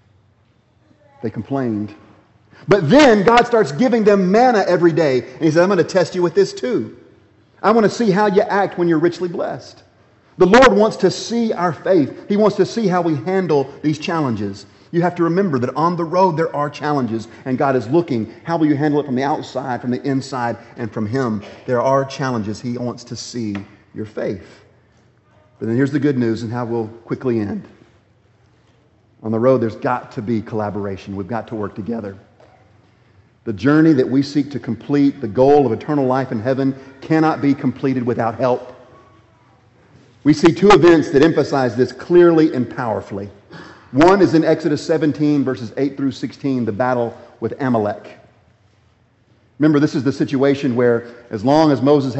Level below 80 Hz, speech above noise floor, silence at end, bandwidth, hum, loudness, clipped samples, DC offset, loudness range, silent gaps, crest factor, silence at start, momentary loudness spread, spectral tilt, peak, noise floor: -50 dBFS; 40 dB; 0 s; 8.2 kHz; none; -17 LUFS; under 0.1%; under 0.1%; 8 LU; none; 16 dB; 1.25 s; 14 LU; -6.5 dB/octave; -2 dBFS; -56 dBFS